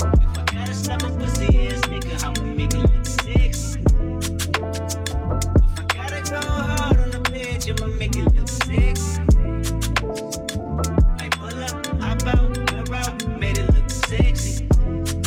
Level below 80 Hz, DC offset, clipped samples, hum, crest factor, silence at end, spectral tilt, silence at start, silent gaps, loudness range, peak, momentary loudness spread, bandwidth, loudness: -22 dBFS; under 0.1%; under 0.1%; none; 14 dB; 0 s; -5 dB/octave; 0 s; none; 1 LU; -6 dBFS; 6 LU; 16 kHz; -22 LUFS